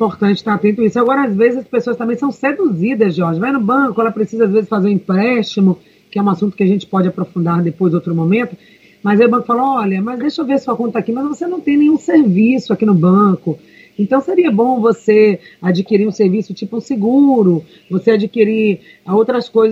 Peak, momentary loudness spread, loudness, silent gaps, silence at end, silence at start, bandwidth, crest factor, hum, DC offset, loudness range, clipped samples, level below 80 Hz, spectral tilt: 0 dBFS; 8 LU; -14 LUFS; none; 0 s; 0 s; 7.8 kHz; 14 dB; none; under 0.1%; 3 LU; under 0.1%; -60 dBFS; -8.5 dB/octave